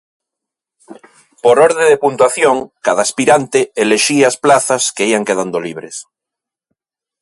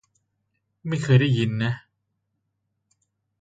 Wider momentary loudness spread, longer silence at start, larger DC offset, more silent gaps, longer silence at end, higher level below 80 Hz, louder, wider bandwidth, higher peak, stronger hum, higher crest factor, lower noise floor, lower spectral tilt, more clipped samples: second, 11 LU vs 15 LU; about the same, 0.9 s vs 0.85 s; neither; neither; second, 1.2 s vs 1.65 s; about the same, -60 dBFS vs -60 dBFS; first, -12 LUFS vs -22 LUFS; first, 11.5 kHz vs 9 kHz; first, 0 dBFS vs -4 dBFS; neither; second, 14 dB vs 22 dB; first, -84 dBFS vs -77 dBFS; second, -3 dB/octave vs -7 dB/octave; neither